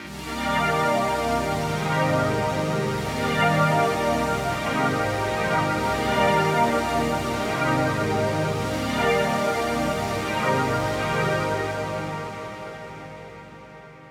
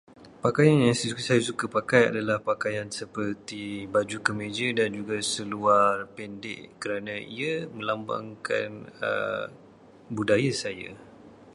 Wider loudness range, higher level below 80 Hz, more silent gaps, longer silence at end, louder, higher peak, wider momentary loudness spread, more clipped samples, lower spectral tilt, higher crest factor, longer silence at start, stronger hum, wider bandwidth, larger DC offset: second, 3 LU vs 7 LU; first, -44 dBFS vs -64 dBFS; neither; about the same, 0 s vs 0 s; first, -23 LUFS vs -27 LUFS; second, -8 dBFS vs -4 dBFS; about the same, 13 LU vs 14 LU; neither; about the same, -5 dB/octave vs -5 dB/octave; second, 16 dB vs 22 dB; about the same, 0 s vs 0.1 s; neither; first, 17.5 kHz vs 11.5 kHz; neither